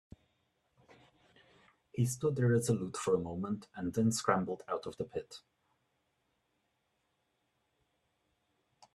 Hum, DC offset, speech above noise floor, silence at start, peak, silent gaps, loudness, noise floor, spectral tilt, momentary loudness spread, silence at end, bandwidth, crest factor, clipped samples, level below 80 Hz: none; under 0.1%; 47 dB; 1.95 s; -12 dBFS; none; -34 LUFS; -80 dBFS; -6 dB/octave; 12 LU; 3.55 s; 13.5 kHz; 26 dB; under 0.1%; -70 dBFS